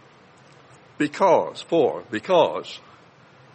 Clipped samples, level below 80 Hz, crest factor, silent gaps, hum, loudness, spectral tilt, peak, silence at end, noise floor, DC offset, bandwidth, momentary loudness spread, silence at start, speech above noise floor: under 0.1%; -72 dBFS; 20 dB; none; none; -22 LUFS; -5.5 dB/octave; -4 dBFS; 0.75 s; -51 dBFS; under 0.1%; 8.8 kHz; 14 LU; 1 s; 30 dB